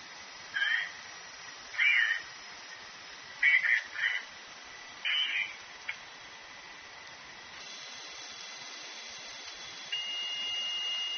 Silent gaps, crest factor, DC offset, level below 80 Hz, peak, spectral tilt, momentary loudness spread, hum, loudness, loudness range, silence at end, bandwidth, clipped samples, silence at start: none; 22 dB; under 0.1%; -76 dBFS; -14 dBFS; 4.5 dB/octave; 21 LU; none; -31 LUFS; 14 LU; 0 s; 6.8 kHz; under 0.1%; 0 s